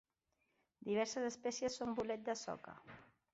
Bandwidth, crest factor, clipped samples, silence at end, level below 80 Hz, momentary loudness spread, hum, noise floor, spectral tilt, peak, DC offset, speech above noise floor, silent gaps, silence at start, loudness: 8 kHz; 16 dB; under 0.1%; 0.3 s; -76 dBFS; 18 LU; none; -85 dBFS; -3.5 dB/octave; -26 dBFS; under 0.1%; 43 dB; none; 0.8 s; -42 LUFS